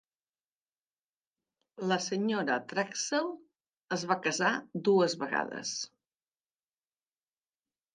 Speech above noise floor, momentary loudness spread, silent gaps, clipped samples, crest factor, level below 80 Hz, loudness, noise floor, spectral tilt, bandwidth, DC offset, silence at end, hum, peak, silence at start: over 59 dB; 11 LU; 3.84-3.88 s; under 0.1%; 22 dB; -84 dBFS; -31 LUFS; under -90 dBFS; -3.5 dB/octave; 10 kHz; under 0.1%; 2.1 s; none; -12 dBFS; 1.8 s